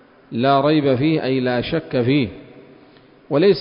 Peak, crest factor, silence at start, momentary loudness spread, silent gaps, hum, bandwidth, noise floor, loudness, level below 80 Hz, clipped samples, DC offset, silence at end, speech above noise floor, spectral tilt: -4 dBFS; 16 dB; 0.3 s; 7 LU; none; none; 5.4 kHz; -48 dBFS; -18 LUFS; -50 dBFS; under 0.1%; under 0.1%; 0 s; 31 dB; -11.5 dB/octave